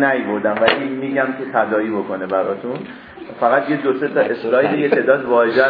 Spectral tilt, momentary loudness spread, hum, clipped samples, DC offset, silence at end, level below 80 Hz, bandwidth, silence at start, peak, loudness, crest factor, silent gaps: -8.5 dB/octave; 10 LU; none; under 0.1%; under 0.1%; 0 s; -62 dBFS; 5.2 kHz; 0 s; 0 dBFS; -18 LUFS; 18 dB; none